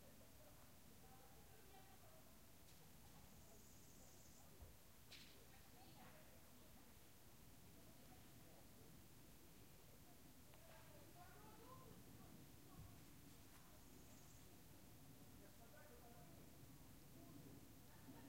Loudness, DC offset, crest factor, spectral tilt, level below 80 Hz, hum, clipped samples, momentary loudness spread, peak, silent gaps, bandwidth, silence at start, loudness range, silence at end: -65 LUFS; under 0.1%; 18 dB; -4 dB/octave; -74 dBFS; none; under 0.1%; 3 LU; -48 dBFS; none; 16 kHz; 0 s; 2 LU; 0 s